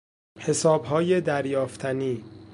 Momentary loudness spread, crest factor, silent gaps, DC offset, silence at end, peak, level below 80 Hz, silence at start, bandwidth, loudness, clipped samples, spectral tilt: 9 LU; 18 dB; none; under 0.1%; 0 s; -8 dBFS; -62 dBFS; 0.35 s; 11.5 kHz; -25 LUFS; under 0.1%; -5.5 dB/octave